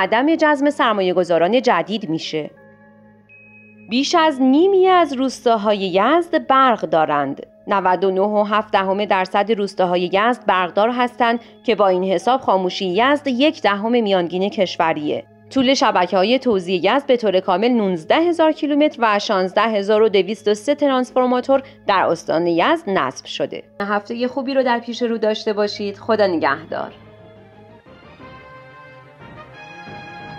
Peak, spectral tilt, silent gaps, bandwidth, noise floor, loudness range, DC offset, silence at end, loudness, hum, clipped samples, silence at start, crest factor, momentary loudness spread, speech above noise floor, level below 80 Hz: -4 dBFS; -5 dB/octave; none; 11.5 kHz; -48 dBFS; 4 LU; under 0.1%; 0 s; -18 LUFS; none; under 0.1%; 0 s; 14 dB; 8 LU; 30 dB; -62 dBFS